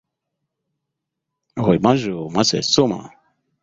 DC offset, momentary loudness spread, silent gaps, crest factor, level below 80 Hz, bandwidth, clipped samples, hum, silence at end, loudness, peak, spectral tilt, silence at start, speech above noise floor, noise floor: under 0.1%; 9 LU; none; 20 dB; -52 dBFS; 8 kHz; under 0.1%; none; 0.55 s; -18 LUFS; -2 dBFS; -4.5 dB/octave; 1.55 s; 62 dB; -81 dBFS